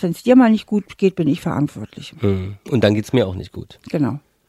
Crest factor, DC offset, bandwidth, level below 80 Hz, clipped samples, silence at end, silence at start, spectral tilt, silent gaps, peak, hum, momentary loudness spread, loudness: 16 dB; under 0.1%; 13.5 kHz; -50 dBFS; under 0.1%; 0.3 s; 0 s; -7.5 dB/octave; none; -2 dBFS; none; 18 LU; -18 LUFS